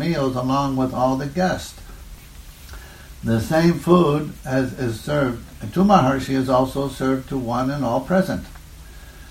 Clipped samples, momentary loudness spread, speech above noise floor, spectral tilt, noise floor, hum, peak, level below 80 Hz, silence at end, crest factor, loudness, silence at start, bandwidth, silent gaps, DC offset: under 0.1%; 23 LU; 21 dB; -7 dB/octave; -41 dBFS; none; -2 dBFS; -42 dBFS; 0 s; 20 dB; -20 LUFS; 0 s; 16.5 kHz; none; under 0.1%